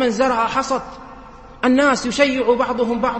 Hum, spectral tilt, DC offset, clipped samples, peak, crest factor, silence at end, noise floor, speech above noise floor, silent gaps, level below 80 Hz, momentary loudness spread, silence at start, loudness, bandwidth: none; -4 dB/octave; under 0.1%; under 0.1%; 0 dBFS; 18 dB; 0 s; -39 dBFS; 22 dB; none; -46 dBFS; 9 LU; 0 s; -18 LUFS; 8.8 kHz